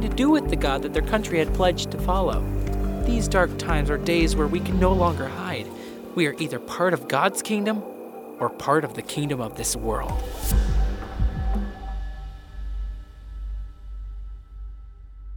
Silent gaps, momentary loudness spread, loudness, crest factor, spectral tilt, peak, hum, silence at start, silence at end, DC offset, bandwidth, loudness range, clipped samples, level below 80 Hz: none; 18 LU; -25 LUFS; 20 dB; -5.5 dB/octave; -4 dBFS; none; 0 s; 0 s; under 0.1%; 19.5 kHz; 10 LU; under 0.1%; -30 dBFS